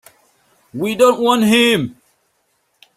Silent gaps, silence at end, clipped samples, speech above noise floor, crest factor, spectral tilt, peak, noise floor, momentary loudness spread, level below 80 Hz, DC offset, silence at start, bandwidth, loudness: none; 1.05 s; under 0.1%; 51 dB; 16 dB; -4 dB/octave; -2 dBFS; -65 dBFS; 14 LU; -60 dBFS; under 0.1%; 0.75 s; 16 kHz; -14 LUFS